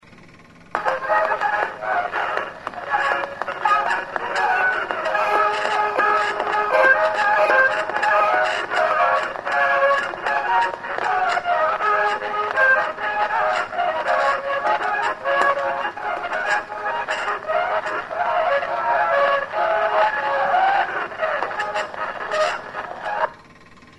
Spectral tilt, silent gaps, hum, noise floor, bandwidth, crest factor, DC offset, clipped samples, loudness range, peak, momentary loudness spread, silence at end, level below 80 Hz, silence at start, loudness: -2.5 dB/octave; none; none; -46 dBFS; 11.5 kHz; 20 dB; 0.1%; under 0.1%; 5 LU; -2 dBFS; 8 LU; 0.45 s; -60 dBFS; 0.05 s; -20 LUFS